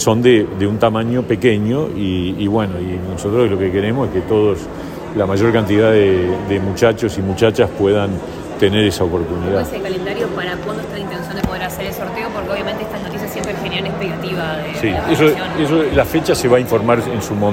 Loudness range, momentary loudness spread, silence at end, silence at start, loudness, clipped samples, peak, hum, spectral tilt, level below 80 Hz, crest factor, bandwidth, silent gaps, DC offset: 7 LU; 9 LU; 0 s; 0 s; -17 LUFS; under 0.1%; 0 dBFS; none; -6 dB/octave; -40 dBFS; 16 dB; 16.5 kHz; none; under 0.1%